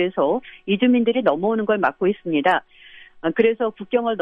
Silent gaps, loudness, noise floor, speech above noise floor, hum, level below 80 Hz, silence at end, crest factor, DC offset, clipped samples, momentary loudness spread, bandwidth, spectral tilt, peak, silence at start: none; -20 LUFS; -46 dBFS; 26 dB; none; -62 dBFS; 0 s; 16 dB; under 0.1%; under 0.1%; 7 LU; 4.9 kHz; -8 dB/octave; -4 dBFS; 0 s